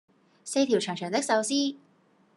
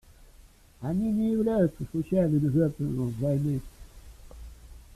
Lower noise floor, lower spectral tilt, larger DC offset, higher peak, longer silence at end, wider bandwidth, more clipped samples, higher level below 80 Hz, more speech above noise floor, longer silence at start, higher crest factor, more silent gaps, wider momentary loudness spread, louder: first, -64 dBFS vs -54 dBFS; second, -3.5 dB/octave vs -9.5 dB/octave; neither; about the same, -10 dBFS vs -12 dBFS; first, 0.6 s vs 0.15 s; second, 12 kHz vs 14 kHz; neither; second, -84 dBFS vs -48 dBFS; first, 37 dB vs 28 dB; first, 0.45 s vs 0.2 s; about the same, 18 dB vs 18 dB; neither; second, 7 LU vs 20 LU; about the same, -27 LUFS vs -27 LUFS